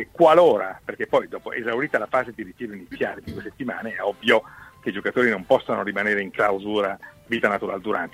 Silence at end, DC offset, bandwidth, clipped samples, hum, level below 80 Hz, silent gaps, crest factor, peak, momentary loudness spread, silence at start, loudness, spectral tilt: 0.05 s; under 0.1%; 15 kHz; under 0.1%; none; -58 dBFS; none; 20 dB; -2 dBFS; 15 LU; 0 s; -22 LUFS; -5.5 dB/octave